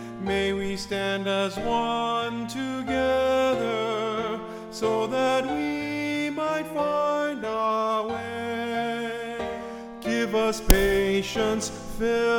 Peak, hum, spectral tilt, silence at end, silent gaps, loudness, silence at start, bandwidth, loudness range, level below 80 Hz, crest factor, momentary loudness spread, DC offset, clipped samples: -2 dBFS; none; -4.5 dB/octave; 0 s; none; -26 LUFS; 0 s; 18 kHz; 2 LU; -36 dBFS; 24 dB; 8 LU; under 0.1%; under 0.1%